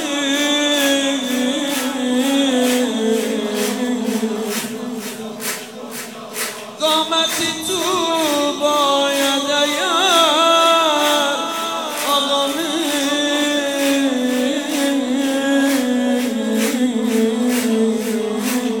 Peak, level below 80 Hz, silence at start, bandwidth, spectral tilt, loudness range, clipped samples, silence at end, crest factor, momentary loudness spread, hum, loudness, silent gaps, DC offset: -2 dBFS; -70 dBFS; 0 s; 18 kHz; -2 dB/octave; 6 LU; under 0.1%; 0 s; 16 dB; 10 LU; none; -17 LUFS; none; 0.1%